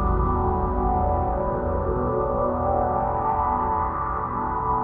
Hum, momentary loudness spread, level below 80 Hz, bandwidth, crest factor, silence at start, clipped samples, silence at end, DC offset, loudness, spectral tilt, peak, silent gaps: none; 3 LU; -30 dBFS; 3.2 kHz; 12 dB; 0 s; under 0.1%; 0 s; under 0.1%; -24 LUFS; -13 dB/octave; -10 dBFS; none